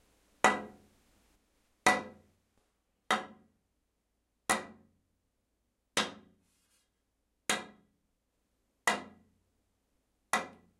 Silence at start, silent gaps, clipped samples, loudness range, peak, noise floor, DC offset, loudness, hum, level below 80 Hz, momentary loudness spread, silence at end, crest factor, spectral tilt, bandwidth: 0.45 s; none; under 0.1%; 5 LU; -8 dBFS; -81 dBFS; under 0.1%; -33 LUFS; none; -72 dBFS; 22 LU; 0.3 s; 32 dB; -1.5 dB/octave; 16 kHz